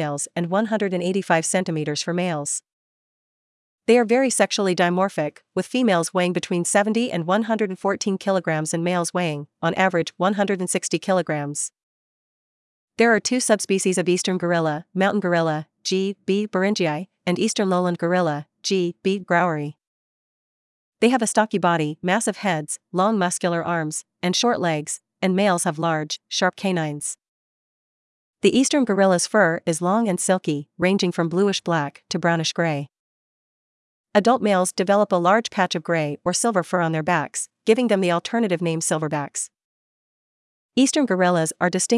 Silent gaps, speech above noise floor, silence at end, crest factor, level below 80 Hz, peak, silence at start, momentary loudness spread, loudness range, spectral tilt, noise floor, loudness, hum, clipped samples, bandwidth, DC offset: 2.73-3.78 s, 11.83-12.88 s, 19.87-20.92 s, 27.28-28.34 s, 32.99-34.04 s, 39.64-40.69 s; over 69 dB; 0 s; 20 dB; -72 dBFS; -2 dBFS; 0 s; 8 LU; 3 LU; -4.5 dB/octave; under -90 dBFS; -21 LUFS; none; under 0.1%; 12 kHz; under 0.1%